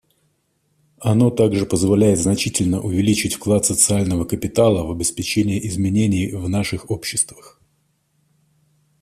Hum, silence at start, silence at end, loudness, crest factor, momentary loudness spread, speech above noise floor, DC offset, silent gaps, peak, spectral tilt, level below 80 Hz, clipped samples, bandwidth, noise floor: none; 1 s; 1.7 s; -18 LUFS; 18 dB; 7 LU; 48 dB; under 0.1%; none; 0 dBFS; -5 dB/octave; -46 dBFS; under 0.1%; 15 kHz; -66 dBFS